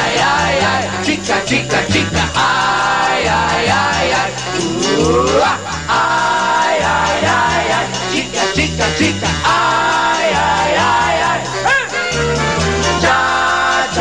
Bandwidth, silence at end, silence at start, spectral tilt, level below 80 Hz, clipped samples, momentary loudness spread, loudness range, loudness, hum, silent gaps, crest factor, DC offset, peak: 12 kHz; 0 s; 0 s; -3.5 dB/octave; -34 dBFS; under 0.1%; 4 LU; 1 LU; -14 LUFS; none; none; 12 dB; 0.5%; -2 dBFS